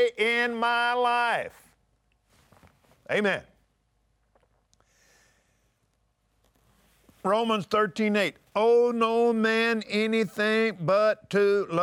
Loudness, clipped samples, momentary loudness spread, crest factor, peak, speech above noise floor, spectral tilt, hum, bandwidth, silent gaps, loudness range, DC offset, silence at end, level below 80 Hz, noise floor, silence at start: -25 LUFS; under 0.1%; 5 LU; 14 dB; -12 dBFS; 47 dB; -5 dB/octave; none; 14 kHz; none; 11 LU; under 0.1%; 0 s; -70 dBFS; -72 dBFS; 0 s